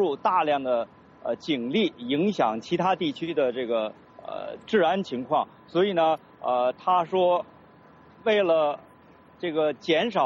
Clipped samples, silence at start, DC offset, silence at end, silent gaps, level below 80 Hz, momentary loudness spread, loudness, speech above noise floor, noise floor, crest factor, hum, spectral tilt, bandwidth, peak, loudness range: under 0.1%; 0 s; under 0.1%; 0 s; none; -70 dBFS; 12 LU; -25 LUFS; 28 dB; -53 dBFS; 16 dB; none; -6 dB/octave; 7.6 kHz; -10 dBFS; 2 LU